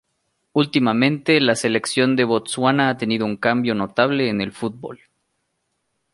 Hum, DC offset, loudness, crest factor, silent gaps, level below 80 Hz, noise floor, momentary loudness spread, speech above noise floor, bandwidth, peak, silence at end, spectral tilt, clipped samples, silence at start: none; under 0.1%; -19 LUFS; 18 dB; none; -62 dBFS; -73 dBFS; 9 LU; 54 dB; 11.5 kHz; -2 dBFS; 1.2 s; -5 dB/octave; under 0.1%; 0.55 s